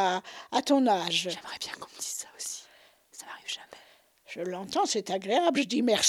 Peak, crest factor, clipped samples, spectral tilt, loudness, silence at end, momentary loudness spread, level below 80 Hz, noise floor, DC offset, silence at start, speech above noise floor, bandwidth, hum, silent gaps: -10 dBFS; 20 dB; under 0.1%; -2.5 dB/octave; -29 LUFS; 0 s; 16 LU; -76 dBFS; -59 dBFS; under 0.1%; 0 s; 31 dB; 17.5 kHz; none; none